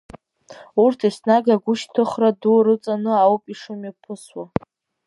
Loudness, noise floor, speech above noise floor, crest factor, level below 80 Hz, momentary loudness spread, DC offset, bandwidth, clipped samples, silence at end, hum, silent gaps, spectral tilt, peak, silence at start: -19 LUFS; -45 dBFS; 26 dB; 18 dB; -58 dBFS; 17 LU; under 0.1%; 11.5 kHz; under 0.1%; 0.6 s; none; none; -6.5 dB/octave; -2 dBFS; 0.15 s